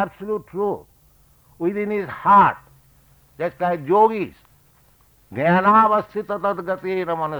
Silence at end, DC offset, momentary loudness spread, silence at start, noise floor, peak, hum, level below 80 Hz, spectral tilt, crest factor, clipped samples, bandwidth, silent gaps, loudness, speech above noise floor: 0 s; under 0.1%; 15 LU; 0 s; -55 dBFS; -4 dBFS; none; -58 dBFS; -8 dB/octave; 16 dB; under 0.1%; over 20 kHz; none; -20 LUFS; 36 dB